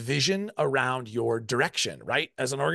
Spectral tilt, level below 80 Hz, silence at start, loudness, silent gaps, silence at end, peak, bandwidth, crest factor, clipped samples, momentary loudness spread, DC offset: -3.5 dB/octave; -68 dBFS; 0 s; -27 LUFS; none; 0 s; -10 dBFS; 12.5 kHz; 18 dB; under 0.1%; 4 LU; under 0.1%